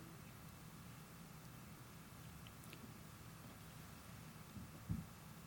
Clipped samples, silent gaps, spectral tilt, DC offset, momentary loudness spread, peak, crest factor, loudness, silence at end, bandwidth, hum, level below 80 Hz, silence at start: under 0.1%; none; -5 dB/octave; under 0.1%; 8 LU; -30 dBFS; 24 dB; -55 LUFS; 0 s; over 20 kHz; none; -66 dBFS; 0 s